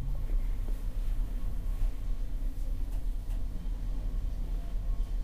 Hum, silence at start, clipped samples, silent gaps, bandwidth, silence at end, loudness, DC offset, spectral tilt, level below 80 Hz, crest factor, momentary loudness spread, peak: none; 0 s; under 0.1%; none; 4.9 kHz; 0 s; -39 LUFS; under 0.1%; -7 dB/octave; -32 dBFS; 10 dB; 3 LU; -20 dBFS